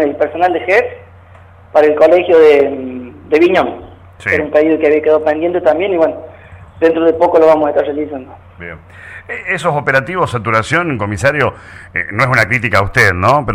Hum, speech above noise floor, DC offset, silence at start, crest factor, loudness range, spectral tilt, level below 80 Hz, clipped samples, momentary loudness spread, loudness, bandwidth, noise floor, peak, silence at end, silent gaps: none; 27 dB; under 0.1%; 0 s; 12 dB; 4 LU; -6 dB/octave; -42 dBFS; under 0.1%; 17 LU; -12 LUFS; 15 kHz; -39 dBFS; 0 dBFS; 0 s; none